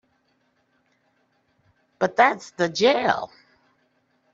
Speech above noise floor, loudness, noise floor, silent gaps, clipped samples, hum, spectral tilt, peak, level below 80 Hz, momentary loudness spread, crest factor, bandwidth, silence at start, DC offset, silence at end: 47 dB; -21 LUFS; -68 dBFS; none; under 0.1%; none; -4 dB/octave; -4 dBFS; -70 dBFS; 8 LU; 22 dB; 7.8 kHz; 2 s; under 0.1%; 1.1 s